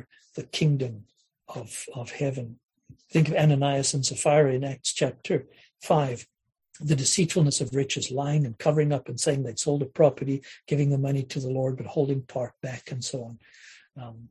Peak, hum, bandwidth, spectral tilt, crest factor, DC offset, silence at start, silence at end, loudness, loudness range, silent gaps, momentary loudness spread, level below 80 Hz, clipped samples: -8 dBFS; none; 12 kHz; -5 dB/octave; 20 dB; under 0.1%; 0.35 s; 0.05 s; -26 LUFS; 4 LU; 2.65-2.69 s; 15 LU; -62 dBFS; under 0.1%